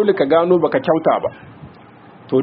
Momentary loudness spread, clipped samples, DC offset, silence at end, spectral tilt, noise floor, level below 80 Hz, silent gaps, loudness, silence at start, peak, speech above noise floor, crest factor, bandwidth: 7 LU; under 0.1%; under 0.1%; 0 s; -5.5 dB/octave; -43 dBFS; -58 dBFS; none; -16 LUFS; 0 s; -2 dBFS; 27 dB; 16 dB; 5.4 kHz